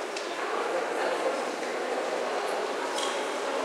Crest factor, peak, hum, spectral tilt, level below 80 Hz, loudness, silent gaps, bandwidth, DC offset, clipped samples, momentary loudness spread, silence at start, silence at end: 14 dB; -16 dBFS; none; -1.5 dB/octave; under -90 dBFS; -30 LUFS; none; 16 kHz; under 0.1%; under 0.1%; 3 LU; 0 s; 0 s